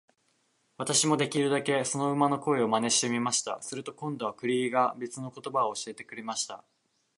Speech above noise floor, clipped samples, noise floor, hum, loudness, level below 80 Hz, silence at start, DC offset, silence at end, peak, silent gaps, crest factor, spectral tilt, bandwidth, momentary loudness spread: 43 dB; under 0.1%; -72 dBFS; none; -29 LUFS; -78 dBFS; 0.8 s; under 0.1%; 0.6 s; -10 dBFS; none; 20 dB; -3.5 dB/octave; 11.5 kHz; 13 LU